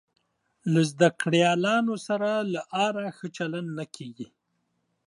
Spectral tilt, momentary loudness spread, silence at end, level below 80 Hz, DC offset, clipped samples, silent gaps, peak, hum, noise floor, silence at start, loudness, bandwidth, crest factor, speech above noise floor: -5.5 dB/octave; 17 LU; 0.8 s; -76 dBFS; under 0.1%; under 0.1%; none; -6 dBFS; none; -76 dBFS; 0.65 s; -26 LUFS; 11.5 kHz; 22 dB; 50 dB